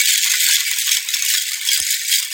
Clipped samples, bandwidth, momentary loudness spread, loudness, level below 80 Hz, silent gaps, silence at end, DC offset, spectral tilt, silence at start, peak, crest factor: under 0.1%; 17 kHz; 3 LU; -15 LUFS; -68 dBFS; none; 0 s; under 0.1%; 7 dB/octave; 0 s; 0 dBFS; 18 dB